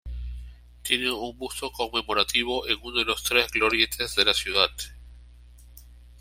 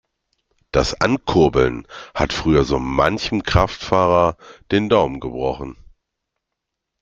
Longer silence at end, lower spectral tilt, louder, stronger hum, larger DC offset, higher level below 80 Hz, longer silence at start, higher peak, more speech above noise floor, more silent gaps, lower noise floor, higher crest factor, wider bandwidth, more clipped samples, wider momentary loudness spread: second, 0 s vs 1.3 s; second, -2 dB/octave vs -6 dB/octave; second, -24 LUFS vs -18 LUFS; first, 60 Hz at -45 dBFS vs none; neither; second, -44 dBFS vs -36 dBFS; second, 0.05 s vs 0.75 s; second, -4 dBFS vs 0 dBFS; second, 23 dB vs 62 dB; neither; second, -49 dBFS vs -80 dBFS; about the same, 24 dB vs 20 dB; first, 16 kHz vs 8.4 kHz; neither; first, 17 LU vs 8 LU